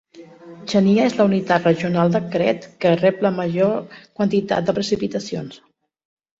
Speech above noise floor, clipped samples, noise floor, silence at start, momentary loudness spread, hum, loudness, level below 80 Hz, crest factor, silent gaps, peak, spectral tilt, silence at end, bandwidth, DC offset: 23 dB; under 0.1%; -42 dBFS; 0.15 s; 11 LU; none; -19 LUFS; -58 dBFS; 16 dB; none; -4 dBFS; -6.5 dB/octave; 0.85 s; 7.8 kHz; under 0.1%